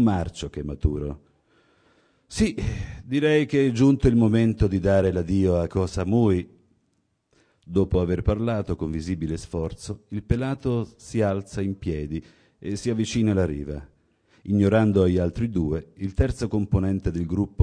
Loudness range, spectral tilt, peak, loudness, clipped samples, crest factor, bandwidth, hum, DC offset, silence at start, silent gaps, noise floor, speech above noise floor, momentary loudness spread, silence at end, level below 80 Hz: 7 LU; -7.5 dB/octave; -4 dBFS; -24 LUFS; under 0.1%; 20 dB; 10.5 kHz; none; under 0.1%; 0 s; none; -71 dBFS; 48 dB; 14 LU; 0 s; -38 dBFS